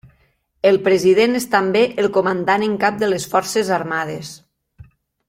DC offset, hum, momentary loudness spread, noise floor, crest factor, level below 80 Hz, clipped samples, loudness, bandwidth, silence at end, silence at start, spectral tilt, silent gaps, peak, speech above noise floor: under 0.1%; none; 9 LU; -61 dBFS; 16 dB; -58 dBFS; under 0.1%; -17 LUFS; 16 kHz; 0.95 s; 0.65 s; -4.5 dB/octave; none; -2 dBFS; 44 dB